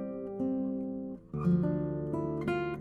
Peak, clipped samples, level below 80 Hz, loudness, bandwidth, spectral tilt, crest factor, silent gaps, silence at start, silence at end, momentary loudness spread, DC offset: -18 dBFS; under 0.1%; -56 dBFS; -33 LUFS; 4.8 kHz; -10 dB/octave; 14 dB; none; 0 s; 0 s; 9 LU; under 0.1%